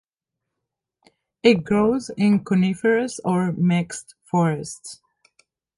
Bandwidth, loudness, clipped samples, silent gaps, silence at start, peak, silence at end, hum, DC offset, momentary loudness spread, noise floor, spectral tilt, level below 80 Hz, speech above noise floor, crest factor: 11.5 kHz; -21 LUFS; under 0.1%; none; 1.45 s; -4 dBFS; 0.85 s; none; under 0.1%; 14 LU; -84 dBFS; -6.5 dB/octave; -58 dBFS; 63 dB; 20 dB